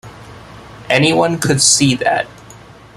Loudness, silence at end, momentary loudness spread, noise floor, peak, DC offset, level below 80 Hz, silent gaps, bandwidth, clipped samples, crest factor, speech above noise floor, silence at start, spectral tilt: -13 LUFS; 0.4 s; 8 LU; -39 dBFS; 0 dBFS; under 0.1%; -46 dBFS; none; 15.5 kHz; under 0.1%; 16 dB; 26 dB; 0.05 s; -3 dB/octave